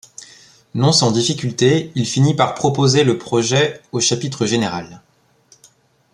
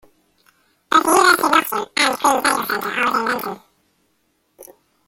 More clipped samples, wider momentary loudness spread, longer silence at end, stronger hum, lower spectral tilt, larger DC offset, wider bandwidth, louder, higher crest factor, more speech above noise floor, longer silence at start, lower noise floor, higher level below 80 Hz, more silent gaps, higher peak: neither; about the same, 8 LU vs 10 LU; first, 1.15 s vs 0.45 s; neither; first, -4.5 dB/octave vs -1.5 dB/octave; neither; second, 11.5 kHz vs 17 kHz; about the same, -16 LUFS vs -17 LUFS; about the same, 16 dB vs 20 dB; second, 37 dB vs 46 dB; second, 0.2 s vs 0.9 s; second, -54 dBFS vs -66 dBFS; about the same, -56 dBFS vs -60 dBFS; neither; about the same, -2 dBFS vs 0 dBFS